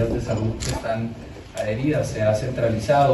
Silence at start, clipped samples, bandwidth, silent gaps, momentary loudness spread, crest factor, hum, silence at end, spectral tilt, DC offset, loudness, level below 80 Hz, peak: 0 s; under 0.1%; 12.5 kHz; none; 10 LU; 14 dB; none; 0 s; -6.5 dB/octave; under 0.1%; -24 LUFS; -38 dBFS; -8 dBFS